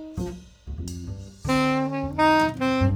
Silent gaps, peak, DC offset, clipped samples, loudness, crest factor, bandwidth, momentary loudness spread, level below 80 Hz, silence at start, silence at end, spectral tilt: none; -8 dBFS; under 0.1%; under 0.1%; -24 LUFS; 16 dB; 16.5 kHz; 17 LU; -40 dBFS; 0 s; 0 s; -6 dB/octave